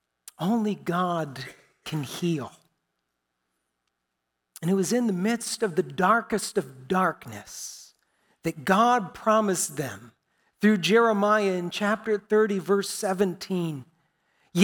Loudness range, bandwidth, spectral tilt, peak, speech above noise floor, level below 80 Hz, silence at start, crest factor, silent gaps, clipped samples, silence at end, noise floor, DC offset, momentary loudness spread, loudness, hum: 9 LU; 18.5 kHz; -5 dB/octave; -6 dBFS; 56 dB; -68 dBFS; 0.4 s; 20 dB; none; under 0.1%; 0 s; -81 dBFS; under 0.1%; 16 LU; -25 LUFS; none